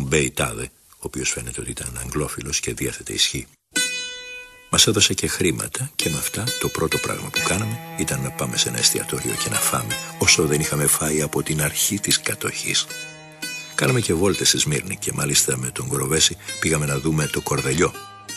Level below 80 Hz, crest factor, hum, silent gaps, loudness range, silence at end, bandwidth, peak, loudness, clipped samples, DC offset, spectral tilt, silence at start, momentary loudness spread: -44 dBFS; 20 dB; none; none; 5 LU; 0 s; 13 kHz; -2 dBFS; -21 LUFS; under 0.1%; under 0.1%; -2.5 dB/octave; 0 s; 12 LU